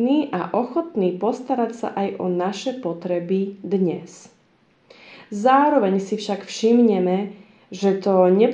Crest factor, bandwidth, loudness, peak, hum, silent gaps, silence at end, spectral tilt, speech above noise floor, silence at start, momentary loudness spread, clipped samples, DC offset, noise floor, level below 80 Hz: 18 dB; 9.6 kHz; -21 LUFS; -4 dBFS; none; none; 0 s; -6.5 dB/octave; 39 dB; 0 s; 11 LU; under 0.1%; under 0.1%; -59 dBFS; -74 dBFS